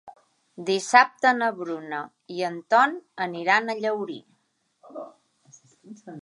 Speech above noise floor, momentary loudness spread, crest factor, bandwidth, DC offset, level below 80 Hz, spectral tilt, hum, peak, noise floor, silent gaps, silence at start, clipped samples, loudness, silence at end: 47 dB; 23 LU; 24 dB; 11.5 kHz; under 0.1%; -84 dBFS; -3.5 dB/octave; none; -2 dBFS; -71 dBFS; none; 0.05 s; under 0.1%; -23 LUFS; 0 s